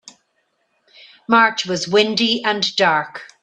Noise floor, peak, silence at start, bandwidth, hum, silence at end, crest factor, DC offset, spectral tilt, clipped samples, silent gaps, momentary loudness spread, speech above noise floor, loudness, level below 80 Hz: -67 dBFS; 0 dBFS; 1.3 s; 9.8 kHz; none; 0.15 s; 20 dB; under 0.1%; -3 dB/octave; under 0.1%; none; 8 LU; 50 dB; -16 LUFS; -64 dBFS